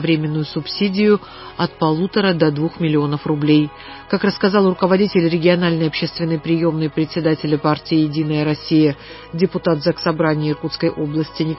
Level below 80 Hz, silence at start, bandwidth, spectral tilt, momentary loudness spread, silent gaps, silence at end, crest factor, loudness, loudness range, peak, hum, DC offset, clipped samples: -50 dBFS; 0 s; 5.8 kHz; -10.5 dB/octave; 7 LU; none; 0 s; 16 dB; -18 LUFS; 2 LU; -2 dBFS; none; under 0.1%; under 0.1%